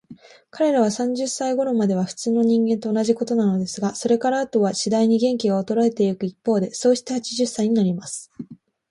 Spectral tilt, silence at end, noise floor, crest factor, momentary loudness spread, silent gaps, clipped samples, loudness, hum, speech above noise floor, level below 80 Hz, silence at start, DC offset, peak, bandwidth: -5.5 dB/octave; 0.35 s; -46 dBFS; 14 dB; 7 LU; none; under 0.1%; -21 LUFS; none; 25 dB; -66 dBFS; 0.1 s; under 0.1%; -6 dBFS; 11.5 kHz